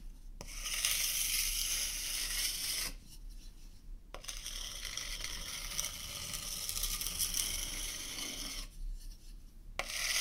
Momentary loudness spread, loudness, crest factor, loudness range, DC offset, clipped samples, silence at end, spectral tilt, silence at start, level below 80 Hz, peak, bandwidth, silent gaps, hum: 22 LU; -36 LUFS; 30 dB; 7 LU; under 0.1%; under 0.1%; 0 s; 0.5 dB/octave; 0 s; -48 dBFS; -10 dBFS; 17.5 kHz; none; none